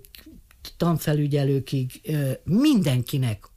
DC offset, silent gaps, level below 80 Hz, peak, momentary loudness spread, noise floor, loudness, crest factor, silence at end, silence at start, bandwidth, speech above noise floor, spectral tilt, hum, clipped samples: under 0.1%; none; -52 dBFS; -10 dBFS; 9 LU; -48 dBFS; -23 LUFS; 14 dB; 0.2 s; 0.25 s; 15.5 kHz; 25 dB; -7 dB/octave; none; under 0.1%